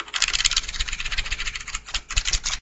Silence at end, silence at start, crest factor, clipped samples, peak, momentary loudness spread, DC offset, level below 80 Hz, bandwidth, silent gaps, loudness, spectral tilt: 0 s; 0 s; 26 dB; under 0.1%; 0 dBFS; 9 LU; under 0.1%; -32 dBFS; 8.6 kHz; none; -24 LUFS; 1 dB/octave